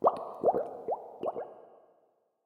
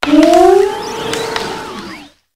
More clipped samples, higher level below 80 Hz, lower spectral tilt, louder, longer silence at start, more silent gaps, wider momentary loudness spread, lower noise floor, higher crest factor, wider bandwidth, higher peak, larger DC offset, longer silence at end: neither; second, -74 dBFS vs -40 dBFS; first, -8 dB/octave vs -4 dB/octave; second, -34 LUFS vs -12 LUFS; about the same, 0 s vs 0 s; neither; second, 15 LU vs 19 LU; first, -71 dBFS vs -33 dBFS; first, 24 dB vs 12 dB; second, 11 kHz vs 16 kHz; second, -10 dBFS vs 0 dBFS; neither; first, 0.8 s vs 0.3 s